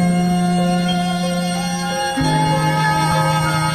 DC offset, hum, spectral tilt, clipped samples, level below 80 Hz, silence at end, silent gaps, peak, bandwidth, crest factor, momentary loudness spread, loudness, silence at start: under 0.1%; none; -5 dB/octave; under 0.1%; -40 dBFS; 0 s; none; -6 dBFS; 14.5 kHz; 12 dB; 4 LU; -17 LUFS; 0 s